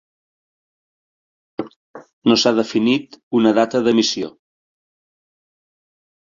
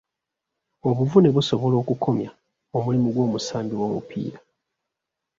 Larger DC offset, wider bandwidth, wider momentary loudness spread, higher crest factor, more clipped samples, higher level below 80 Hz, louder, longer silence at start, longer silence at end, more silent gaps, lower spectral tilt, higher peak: neither; about the same, 7.6 kHz vs 7.6 kHz; about the same, 16 LU vs 14 LU; about the same, 20 dB vs 20 dB; neither; about the same, -64 dBFS vs -60 dBFS; first, -17 LUFS vs -23 LUFS; first, 1.6 s vs 0.85 s; first, 1.95 s vs 1 s; first, 1.76-1.94 s, 2.13-2.22 s, 3.23-3.31 s vs none; second, -4.5 dB/octave vs -7.5 dB/octave; about the same, -2 dBFS vs -4 dBFS